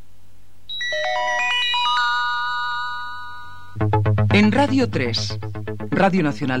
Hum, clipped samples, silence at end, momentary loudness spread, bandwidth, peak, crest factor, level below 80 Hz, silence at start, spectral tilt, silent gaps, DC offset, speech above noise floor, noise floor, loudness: none; under 0.1%; 0 s; 14 LU; 10 kHz; -4 dBFS; 18 dB; -48 dBFS; 0.7 s; -5.5 dB/octave; none; 2%; 34 dB; -53 dBFS; -20 LUFS